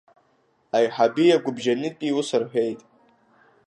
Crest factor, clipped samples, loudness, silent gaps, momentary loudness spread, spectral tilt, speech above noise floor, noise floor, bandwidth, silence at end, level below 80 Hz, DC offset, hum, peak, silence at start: 18 dB; under 0.1%; -23 LUFS; none; 7 LU; -5 dB/octave; 43 dB; -65 dBFS; 10.5 kHz; 0.9 s; -76 dBFS; under 0.1%; none; -6 dBFS; 0.75 s